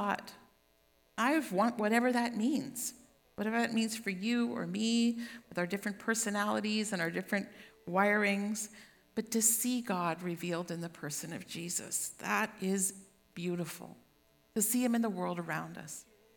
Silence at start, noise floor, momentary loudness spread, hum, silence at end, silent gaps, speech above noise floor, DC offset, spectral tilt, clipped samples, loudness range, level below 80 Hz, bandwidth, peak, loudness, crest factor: 0 s; -70 dBFS; 13 LU; none; 0.35 s; none; 36 dB; under 0.1%; -3.5 dB/octave; under 0.1%; 4 LU; -76 dBFS; 19 kHz; -14 dBFS; -33 LUFS; 22 dB